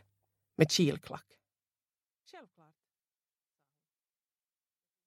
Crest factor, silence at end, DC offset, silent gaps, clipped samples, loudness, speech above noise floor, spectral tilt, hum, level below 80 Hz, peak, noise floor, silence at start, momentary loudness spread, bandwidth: 30 dB; 2.65 s; under 0.1%; none; under 0.1%; -30 LUFS; over 58 dB; -4.5 dB/octave; none; -74 dBFS; -8 dBFS; under -90 dBFS; 0.6 s; 21 LU; 15.5 kHz